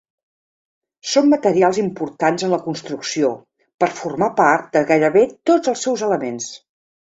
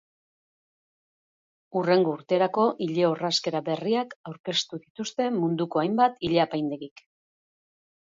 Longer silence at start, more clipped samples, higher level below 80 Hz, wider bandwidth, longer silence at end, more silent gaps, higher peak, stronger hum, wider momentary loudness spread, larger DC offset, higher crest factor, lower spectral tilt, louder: second, 1.05 s vs 1.75 s; neither; first, -62 dBFS vs -68 dBFS; about the same, 8 kHz vs 7.8 kHz; second, 0.6 s vs 1.15 s; second, 3.74-3.78 s vs 4.16-4.24 s, 4.40-4.44 s, 4.90-4.95 s; first, -2 dBFS vs -8 dBFS; neither; about the same, 11 LU vs 12 LU; neither; about the same, 16 dB vs 18 dB; about the same, -4.5 dB/octave vs -5 dB/octave; first, -18 LUFS vs -26 LUFS